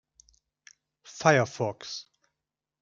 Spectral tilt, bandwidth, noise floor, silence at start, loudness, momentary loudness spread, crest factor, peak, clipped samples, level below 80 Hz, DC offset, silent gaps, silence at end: -4.5 dB/octave; 7.6 kHz; -87 dBFS; 1.1 s; -27 LUFS; 17 LU; 26 dB; -4 dBFS; under 0.1%; -70 dBFS; under 0.1%; none; 0.8 s